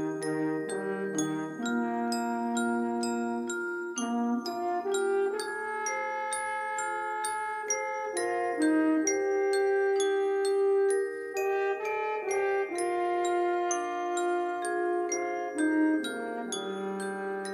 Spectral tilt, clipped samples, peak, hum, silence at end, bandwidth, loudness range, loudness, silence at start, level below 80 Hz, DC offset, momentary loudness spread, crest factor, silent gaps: -3.5 dB/octave; under 0.1%; -16 dBFS; none; 0 s; 14.5 kHz; 4 LU; -30 LUFS; 0 s; -82 dBFS; under 0.1%; 7 LU; 14 dB; none